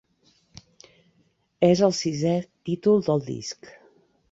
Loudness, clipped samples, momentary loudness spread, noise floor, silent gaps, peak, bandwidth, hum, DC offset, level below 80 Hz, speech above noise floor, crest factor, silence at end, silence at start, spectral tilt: -23 LUFS; under 0.1%; 14 LU; -67 dBFS; none; -6 dBFS; 8 kHz; none; under 0.1%; -62 dBFS; 44 dB; 20 dB; 0.8 s; 1.6 s; -6 dB/octave